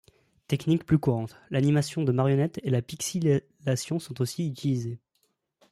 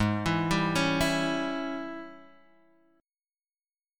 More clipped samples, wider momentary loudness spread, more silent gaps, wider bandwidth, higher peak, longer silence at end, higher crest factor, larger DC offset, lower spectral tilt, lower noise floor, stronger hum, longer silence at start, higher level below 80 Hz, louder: neither; second, 8 LU vs 14 LU; neither; second, 14 kHz vs 17.5 kHz; about the same, -10 dBFS vs -12 dBFS; second, 0.75 s vs 1.75 s; about the same, 18 dB vs 20 dB; neither; first, -6.5 dB/octave vs -5 dB/octave; second, -74 dBFS vs under -90 dBFS; neither; first, 0.5 s vs 0 s; second, -60 dBFS vs -50 dBFS; about the same, -27 LUFS vs -28 LUFS